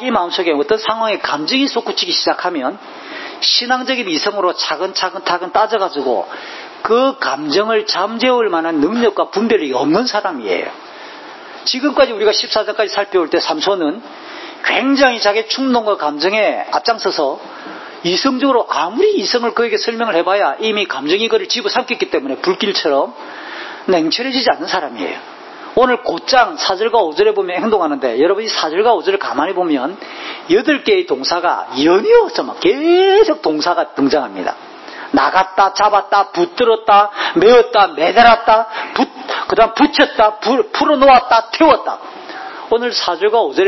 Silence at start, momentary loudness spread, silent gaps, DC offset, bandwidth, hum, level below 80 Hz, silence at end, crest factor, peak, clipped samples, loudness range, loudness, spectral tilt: 0 s; 13 LU; none; under 0.1%; 6.2 kHz; none; -52 dBFS; 0 s; 14 dB; 0 dBFS; under 0.1%; 5 LU; -14 LUFS; -3.5 dB/octave